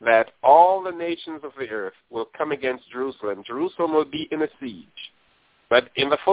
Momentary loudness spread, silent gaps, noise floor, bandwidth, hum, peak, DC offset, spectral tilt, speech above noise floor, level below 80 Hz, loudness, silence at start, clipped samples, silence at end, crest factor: 20 LU; none; -62 dBFS; 4 kHz; none; -2 dBFS; under 0.1%; -8 dB/octave; 37 dB; -64 dBFS; -23 LUFS; 0 s; under 0.1%; 0 s; 20 dB